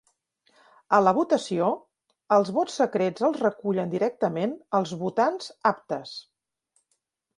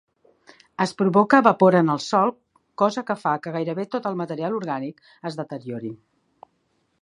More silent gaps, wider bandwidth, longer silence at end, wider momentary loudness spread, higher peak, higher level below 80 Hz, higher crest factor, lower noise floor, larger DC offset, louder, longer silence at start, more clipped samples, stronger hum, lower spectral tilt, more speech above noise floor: neither; about the same, 11 kHz vs 11 kHz; about the same, 1.15 s vs 1.05 s; second, 10 LU vs 17 LU; second, -6 dBFS vs 0 dBFS; about the same, -74 dBFS vs -70 dBFS; about the same, 20 dB vs 22 dB; first, -76 dBFS vs -69 dBFS; neither; second, -25 LUFS vs -22 LUFS; about the same, 0.9 s vs 0.8 s; neither; neither; about the same, -6 dB/octave vs -6.5 dB/octave; first, 52 dB vs 48 dB